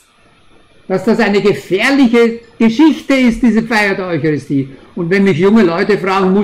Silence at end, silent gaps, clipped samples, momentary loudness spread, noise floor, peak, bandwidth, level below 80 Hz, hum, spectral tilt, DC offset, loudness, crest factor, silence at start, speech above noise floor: 0 s; none; under 0.1%; 7 LU; -48 dBFS; 0 dBFS; 13 kHz; -42 dBFS; none; -6.5 dB/octave; under 0.1%; -12 LUFS; 12 dB; 0.9 s; 36 dB